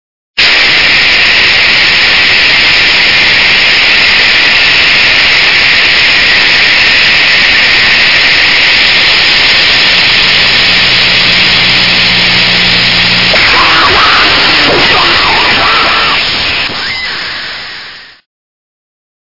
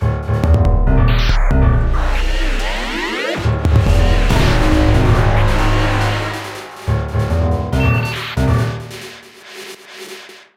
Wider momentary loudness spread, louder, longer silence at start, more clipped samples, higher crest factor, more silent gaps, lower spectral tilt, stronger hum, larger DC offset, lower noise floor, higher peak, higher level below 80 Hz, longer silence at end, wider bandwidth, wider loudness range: second, 4 LU vs 18 LU; first, -3 LUFS vs -16 LUFS; first, 0.35 s vs 0 s; first, 6% vs under 0.1%; second, 6 dB vs 14 dB; neither; second, -2 dB/octave vs -6.5 dB/octave; neither; first, 4% vs under 0.1%; second, -27 dBFS vs -36 dBFS; about the same, 0 dBFS vs 0 dBFS; second, -32 dBFS vs -18 dBFS; first, 1.05 s vs 0.2 s; second, 6 kHz vs 14.5 kHz; about the same, 4 LU vs 4 LU